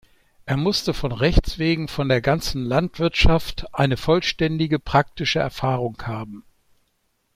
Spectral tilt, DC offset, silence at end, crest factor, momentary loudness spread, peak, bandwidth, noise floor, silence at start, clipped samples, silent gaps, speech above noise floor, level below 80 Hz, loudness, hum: -5.5 dB/octave; under 0.1%; 0.95 s; 20 dB; 8 LU; -2 dBFS; 15.5 kHz; -69 dBFS; 0.45 s; under 0.1%; none; 48 dB; -30 dBFS; -22 LUFS; none